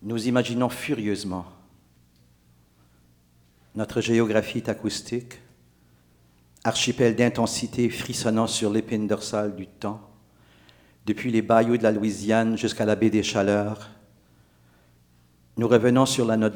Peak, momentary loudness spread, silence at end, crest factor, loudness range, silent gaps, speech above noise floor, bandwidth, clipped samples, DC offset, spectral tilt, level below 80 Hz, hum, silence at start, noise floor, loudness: -4 dBFS; 13 LU; 0 s; 22 dB; 6 LU; none; 36 dB; 20 kHz; under 0.1%; under 0.1%; -5 dB/octave; -60 dBFS; 60 Hz at -50 dBFS; 0 s; -60 dBFS; -24 LUFS